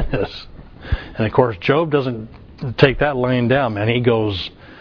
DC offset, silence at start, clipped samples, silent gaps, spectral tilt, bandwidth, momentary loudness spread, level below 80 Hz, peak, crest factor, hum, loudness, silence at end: under 0.1%; 0 s; under 0.1%; none; -8.5 dB/octave; 5.4 kHz; 15 LU; -34 dBFS; 0 dBFS; 18 dB; none; -18 LUFS; 0 s